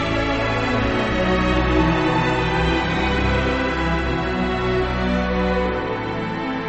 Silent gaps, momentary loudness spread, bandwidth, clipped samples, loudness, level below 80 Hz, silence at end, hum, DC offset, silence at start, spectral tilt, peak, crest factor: none; 4 LU; 8.4 kHz; under 0.1%; -20 LUFS; -28 dBFS; 0 s; none; under 0.1%; 0 s; -6.5 dB/octave; -6 dBFS; 14 dB